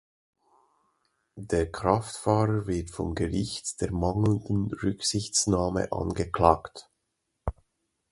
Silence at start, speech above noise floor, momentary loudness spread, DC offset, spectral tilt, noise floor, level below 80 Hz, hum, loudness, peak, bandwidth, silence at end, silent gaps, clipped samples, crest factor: 1.35 s; 53 dB; 14 LU; under 0.1%; -5 dB/octave; -80 dBFS; -44 dBFS; none; -28 LUFS; -4 dBFS; 11.5 kHz; 0.6 s; none; under 0.1%; 26 dB